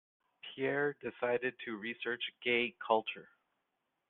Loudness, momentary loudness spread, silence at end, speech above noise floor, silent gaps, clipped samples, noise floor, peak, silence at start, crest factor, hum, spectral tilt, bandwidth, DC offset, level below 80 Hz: -36 LUFS; 11 LU; 0.85 s; 48 dB; none; under 0.1%; -84 dBFS; -16 dBFS; 0.45 s; 22 dB; none; -1.5 dB/octave; 4.3 kHz; under 0.1%; -82 dBFS